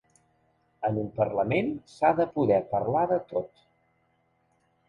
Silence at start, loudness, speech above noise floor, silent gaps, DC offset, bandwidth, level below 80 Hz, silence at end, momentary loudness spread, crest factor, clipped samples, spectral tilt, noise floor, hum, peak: 0.8 s; -27 LUFS; 44 dB; none; under 0.1%; 10.5 kHz; -60 dBFS; 1.4 s; 9 LU; 20 dB; under 0.1%; -8.5 dB/octave; -70 dBFS; none; -10 dBFS